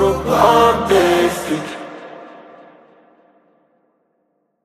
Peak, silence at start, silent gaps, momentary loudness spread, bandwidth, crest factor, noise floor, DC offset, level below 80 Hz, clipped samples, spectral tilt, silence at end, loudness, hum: 0 dBFS; 0 s; none; 23 LU; 15 kHz; 18 dB; -67 dBFS; under 0.1%; -42 dBFS; under 0.1%; -5 dB/octave; 2.25 s; -14 LUFS; none